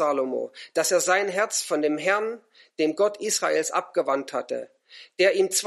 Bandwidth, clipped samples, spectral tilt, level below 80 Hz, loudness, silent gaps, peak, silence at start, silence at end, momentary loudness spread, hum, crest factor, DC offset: 13 kHz; under 0.1%; -2 dB/octave; -82 dBFS; -24 LUFS; none; -8 dBFS; 0 s; 0 s; 12 LU; none; 18 dB; under 0.1%